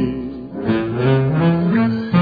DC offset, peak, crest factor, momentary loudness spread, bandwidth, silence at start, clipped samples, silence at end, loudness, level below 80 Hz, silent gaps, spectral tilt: under 0.1%; -4 dBFS; 12 dB; 10 LU; 5 kHz; 0 s; under 0.1%; 0 s; -18 LUFS; -44 dBFS; none; -10.5 dB/octave